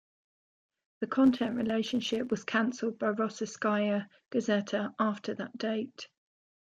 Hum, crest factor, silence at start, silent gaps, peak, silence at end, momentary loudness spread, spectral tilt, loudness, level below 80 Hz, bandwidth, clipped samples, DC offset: none; 18 dB; 1 s; none; -14 dBFS; 0.65 s; 10 LU; -5 dB/octave; -31 LUFS; -70 dBFS; 7.8 kHz; under 0.1%; under 0.1%